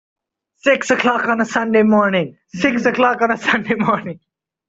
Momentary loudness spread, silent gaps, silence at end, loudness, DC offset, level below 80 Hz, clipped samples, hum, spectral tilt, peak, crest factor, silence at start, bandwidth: 7 LU; none; 0.55 s; -16 LUFS; under 0.1%; -58 dBFS; under 0.1%; none; -5 dB/octave; -2 dBFS; 16 dB; 0.65 s; 7.8 kHz